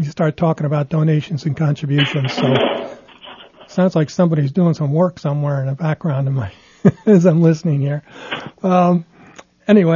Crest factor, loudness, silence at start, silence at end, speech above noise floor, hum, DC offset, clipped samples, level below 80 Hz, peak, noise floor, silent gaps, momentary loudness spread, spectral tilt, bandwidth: 16 dB; -17 LUFS; 0 s; 0 s; 28 dB; none; under 0.1%; under 0.1%; -56 dBFS; 0 dBFS; -44 dBFS; none; 14 LU; -8 dB/octave; 7.2 kHz